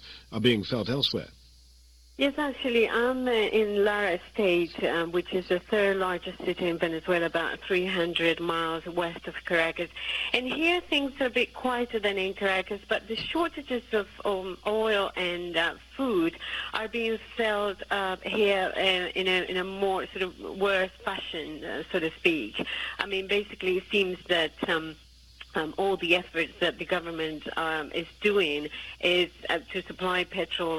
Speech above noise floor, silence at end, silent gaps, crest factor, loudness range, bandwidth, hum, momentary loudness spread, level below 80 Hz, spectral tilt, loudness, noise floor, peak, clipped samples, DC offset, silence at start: 27 dB; 0 s; none; 24 dB; 3 LU; 14.5 kHz; none; 7 LU; -56 dBFS; -5 dB/octave; -28 LUFS; -55 dBFS; -6 dBFS; under 0.1%; under 0.1%; 0 s